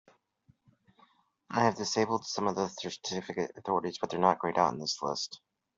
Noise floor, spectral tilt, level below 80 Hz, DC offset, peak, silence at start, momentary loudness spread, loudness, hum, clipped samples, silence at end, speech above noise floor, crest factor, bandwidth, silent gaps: -68 dBFS; -4 dB/octave; -72 dBFS; under 0.1%; -10 dBFS; 1.5 s; 9 LU; -31 LUFS; none; under 0.1%; 0.4 s; 37 dB; 24 dB; 7.8 kHz; none